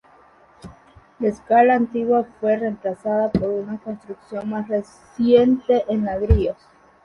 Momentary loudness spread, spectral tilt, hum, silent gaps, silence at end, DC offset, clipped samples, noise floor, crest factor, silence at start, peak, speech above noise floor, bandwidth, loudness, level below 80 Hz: 15 LU; -8.5 dB/octave; none; none; 0.5 s; under 0.1%; under 0.1%; -52 dBFS; 18 dB; 0.65 s; -2 dBFS; 32 dB; 9.8 kHz; -20 LUFS; -34 dBFS